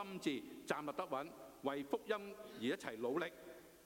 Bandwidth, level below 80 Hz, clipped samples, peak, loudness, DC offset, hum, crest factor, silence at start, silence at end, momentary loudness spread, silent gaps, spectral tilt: 16.5 kHz; -78 dBFS; under 0.1%; -22 dBFS; -44 LUFS; under 0.1%; none; 22 dB; 0 s; 0 s; 9 LU; none; -4.5 dB/octave